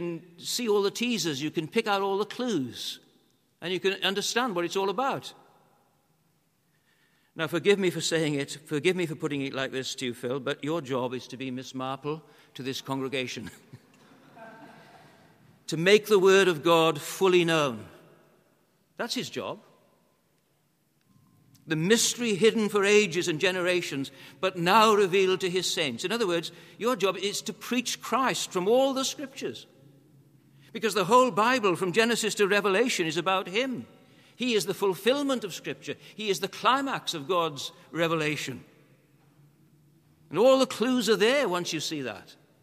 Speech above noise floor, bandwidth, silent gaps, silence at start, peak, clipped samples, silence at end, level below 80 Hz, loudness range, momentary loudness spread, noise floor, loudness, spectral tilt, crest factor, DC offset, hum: 43 dB; 15.5 kHz; none; 0 s; -6 dBFS; under 0.1%; 0.3 s; -78 dBFS; 10 LU; 15 LU; -70 dBFS; -26 LUFS; -3.5 dB/octave; 22 dB; under 0.1%; none